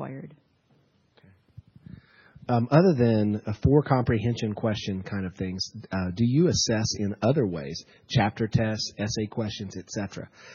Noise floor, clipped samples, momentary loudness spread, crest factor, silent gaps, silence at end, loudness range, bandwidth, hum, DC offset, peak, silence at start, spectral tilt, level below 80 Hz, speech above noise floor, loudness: -65 dBFS; under 0.1%; 13 LU; 22 dB; none; 0 s; 3 LU; 7.4 kHz; none; under 0.1%; -4 dBFS; 0 s; -6 dB/octave; -50 dBFS; 40 dB; -26 LUFS